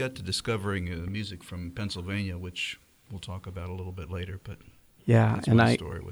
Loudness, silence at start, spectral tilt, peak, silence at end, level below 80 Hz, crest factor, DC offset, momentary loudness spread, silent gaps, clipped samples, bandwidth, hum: -29 LUFS; 0 s; -6 dB/octave; -8 dBFS; 0 s; -52 dBFS; 20 dB; under 0.1%; 18 LU; none; under 0.1%; over 20 kHz; none